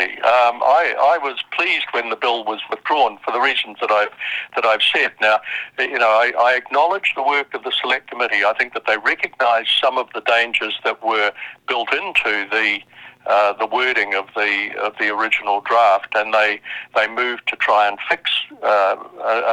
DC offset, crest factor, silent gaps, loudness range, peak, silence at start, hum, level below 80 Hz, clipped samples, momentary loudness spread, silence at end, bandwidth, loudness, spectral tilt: under 0.1%; 18 dB; none; 2 LU; 0 dBFS; 0 s; none; -64 dBFS; under 0.1%; 7 LU; 0 s; 11 kHz; -18 LUFS; -2 dB/octave